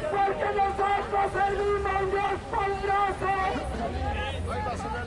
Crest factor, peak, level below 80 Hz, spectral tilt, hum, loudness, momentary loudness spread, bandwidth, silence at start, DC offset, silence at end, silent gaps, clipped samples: 14 dB; -14 dBFS; -40 dBFS; -5.5 dB/octave; none; -27 LUFS; 6 LU; 11.5 kHz; 0 s; under 0.1%; 0 s; none; under 0.1%